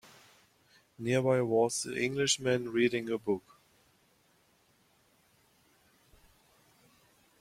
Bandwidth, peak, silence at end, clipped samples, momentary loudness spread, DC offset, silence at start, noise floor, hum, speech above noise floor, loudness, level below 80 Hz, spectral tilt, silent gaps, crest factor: 15.5 kHz; -14 dBFS; 4 s; under 0.1%; 7 LU; under 0.1%; 1 s; -69 dBFS; none; 39 dB; -30 LUFS; -72 dBFS; -4 dB/octave; none; 20 dB